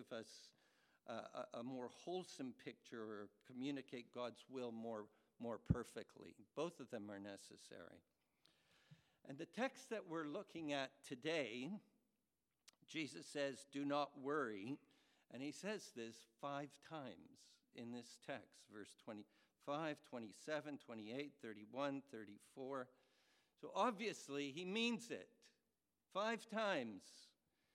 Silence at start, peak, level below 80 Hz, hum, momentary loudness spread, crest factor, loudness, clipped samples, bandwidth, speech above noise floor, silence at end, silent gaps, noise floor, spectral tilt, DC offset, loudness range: 0 s; -22 dBFS; -72 dBFS; none; 16 LU; 26 dB; -49 LUFS; under 0.1%; 15.5 kHz; over 41 dB; 0.45 s; none; under -90 dBFS; -5 dB/octave; under 0.1%; 7 LU